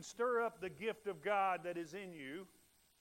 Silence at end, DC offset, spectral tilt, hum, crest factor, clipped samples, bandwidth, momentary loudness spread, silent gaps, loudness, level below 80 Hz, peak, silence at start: 0.55 s; under 0.1%; -4.5 dB/octave; none; 18 dB; under 0.1%; 16 kHz; 13 LU; none; -41 LUFS; -80 dBFS; -24 dBFS; 0 s